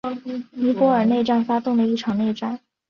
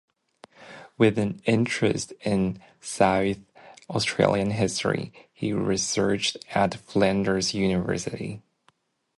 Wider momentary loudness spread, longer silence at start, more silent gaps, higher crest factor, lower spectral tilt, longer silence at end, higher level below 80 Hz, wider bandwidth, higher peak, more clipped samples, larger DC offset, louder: about the same, 12 LU vs 14 LU; second, 0.05 s vs 0.6 s; neither; second, 16 dB vs 22 dB; first, -7 dB/octave vs -5 dB/octave; second, 0.35 s vs 0.8 s; second, -62 dBFS vs -52 dBFS; second, 6.8 kHz vs 11.5 kHz; about the same, -6 dBFS vs -4 dBFS; neither; neither; first, -21 LUFS vs -25 LUFS